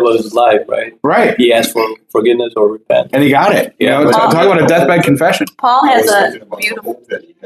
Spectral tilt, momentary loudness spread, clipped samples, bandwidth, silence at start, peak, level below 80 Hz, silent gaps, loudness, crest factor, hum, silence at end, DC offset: -5 dB/octave; 8 LU; under 0.1%; 15 kHz; 0 s; 0 dBFS; -56 dBFS; none; -11 LUFS; 12 dB; none; 0.25 s; under 0.1%